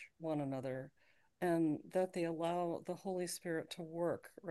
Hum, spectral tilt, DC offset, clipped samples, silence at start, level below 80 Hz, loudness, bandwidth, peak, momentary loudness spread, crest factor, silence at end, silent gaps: none; -6 dB/octave; under 0.1%; under 0.1%; 0 s; -82 dBFS; -40 LUFS; 12.5 kHz; -24 dBFS; 9 LU; 16 dB; 0 s; none